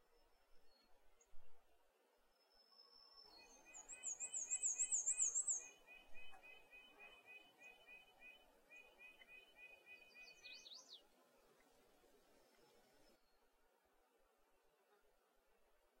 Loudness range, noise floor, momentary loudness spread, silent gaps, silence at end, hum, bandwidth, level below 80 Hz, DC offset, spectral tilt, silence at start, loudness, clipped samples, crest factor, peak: 20 LU; -79 dBFS; 25 LU; none; 2.85 s; none; 16 kHz; -80 dBFS; under 0.1%; 2 dB/octave; 0.55 s; -42 LUFS; under 0.1%; 24 dB; -30 dBFS